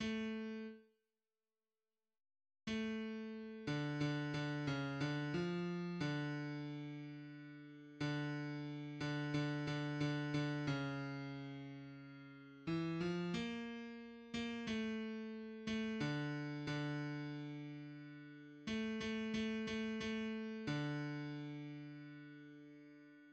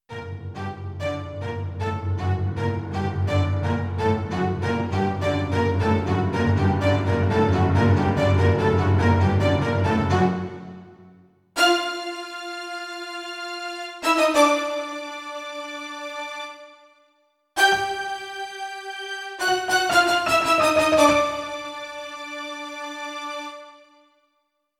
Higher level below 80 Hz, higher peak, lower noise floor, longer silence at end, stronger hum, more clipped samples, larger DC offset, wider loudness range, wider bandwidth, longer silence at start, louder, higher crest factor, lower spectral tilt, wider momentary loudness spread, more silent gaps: second, -72 dBFS vs -46 dBFS; second, -28 dBFS vs -4 dBFS; first, under -90 dBFS vs -73 dBFS; second, 0 s vs 1.05 s; neither; neither; neither; second, 4 LU vs 7 LU; second, 8.6 kHz vs 15.5 kHz; about the same, 0 s vs 0.1 s; second, -44 LUFS vs -23 LUFS; about the same, 16 dB vs 20 dB; about the same, -6.5 dB/octave vs -5.5 dB/octave; about the same, 14 LU vs 14 LU; neither